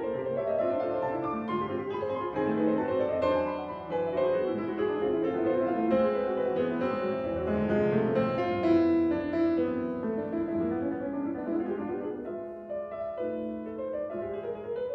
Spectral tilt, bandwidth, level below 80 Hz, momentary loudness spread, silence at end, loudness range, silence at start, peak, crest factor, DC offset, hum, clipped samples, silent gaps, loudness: -9 dB/octave; 5.6 kHz; -58 dBFS; 9 LU; 0 s; 6 LU; 0 s; -14 dBFS; 16 dB; under 0.1%; none; under 0.1%; none; -30 LUFS